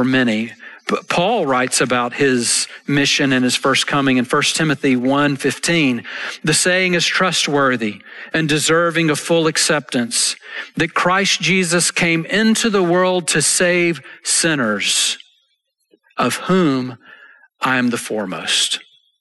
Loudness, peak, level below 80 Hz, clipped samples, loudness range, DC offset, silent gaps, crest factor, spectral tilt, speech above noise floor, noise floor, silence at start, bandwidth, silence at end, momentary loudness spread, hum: -16 LUFS; -4 dBFS; -56 dBFS; under 0.1%; 4 LU; under 0.1%; none; 12 dB; -3 dB/octave; 50 dB; -67 dBFS; 0 s; 12.5 kHz; 0.4 s; 9 LU; none